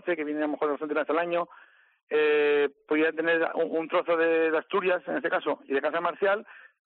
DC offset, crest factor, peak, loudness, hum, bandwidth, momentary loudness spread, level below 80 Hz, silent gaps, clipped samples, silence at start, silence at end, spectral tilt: under 0.1%; 14 dB; -14 dBFS; -27 LUFS; none; 4.3 kHz; 6 LU; -86 dBFS; 2.03-2.07 s; under 0.1%; 0.05 s; 0.25 s; -2 dB/octave